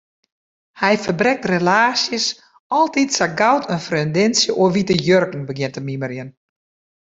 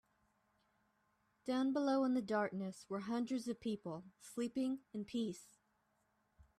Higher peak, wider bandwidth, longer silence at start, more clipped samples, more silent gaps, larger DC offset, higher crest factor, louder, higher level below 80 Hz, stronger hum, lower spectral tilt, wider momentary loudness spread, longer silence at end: first, -2 dBFS vs -26 dBFS; second, 8.2 kHz vs 13 kHz; second, 0.75 s vs 1.45 s; neither; first, 2.60-2.70 s vs none; neither; about the same, 16 dB vs 16 dB; first, -18 LUFS vs -40 LUFS; first, -58 dBFS vs -80 dBFS; neither; second, -4 dB/octave vs -5.5 dB/octave; about the same, 11 LU vs 13 LU; second, 0.85 s vs 1.15 s